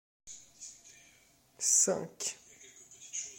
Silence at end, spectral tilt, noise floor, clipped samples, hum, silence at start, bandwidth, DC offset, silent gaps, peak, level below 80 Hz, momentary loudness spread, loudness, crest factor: 0 s; -1 dB/octave; -65 dBFS; under 0.1%; none; 0.25 s; 16.5 kHz; under 0.1%; none; -14 dBFS; -78 dBFS; 27 LU; -30 LUFS; 24 dB